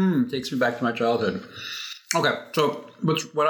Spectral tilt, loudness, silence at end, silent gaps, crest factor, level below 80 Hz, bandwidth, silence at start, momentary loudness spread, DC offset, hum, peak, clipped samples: -4.5 dB/octave; -25 LUFS; 0 s; none; 20 dB; -68 dBFS; 19 kHz; 0 s; 9 LU; under 0.1%; none; -4 dBFS; under 0.1%